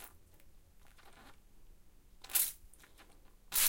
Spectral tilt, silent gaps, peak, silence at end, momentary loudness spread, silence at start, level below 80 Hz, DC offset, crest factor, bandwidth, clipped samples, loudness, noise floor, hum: 1.5 dB/octave; none; -14 dBFS; 0 s; 28 LU; 0 s; -62 dBFS; under 0.1%; 28 dB; 17 kHz; under 0.1%; -34 LUFS; -59 dBFS; none